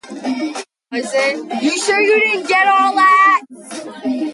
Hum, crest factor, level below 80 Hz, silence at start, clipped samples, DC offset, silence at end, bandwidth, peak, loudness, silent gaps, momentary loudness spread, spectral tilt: none; 14 dB; -70 dBFS; 0.05 s; under 0.1%; under 0.1%; 0 s; 11.5 kHz; -2 dBFS; -14 LUFS; none; 15 LU; -2 dB/octave